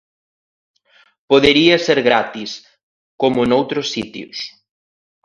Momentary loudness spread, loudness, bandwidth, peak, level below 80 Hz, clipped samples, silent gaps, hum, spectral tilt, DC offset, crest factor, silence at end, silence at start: 17 LU; -15 LUFS; 10.5 kHz; 0 dBFS; -50 dBFS; under 0.1%; 2.83-3.19 s; none; -4.5 dB/octave; under 0.1%; 18 dB; 0.75 s; 1.3 s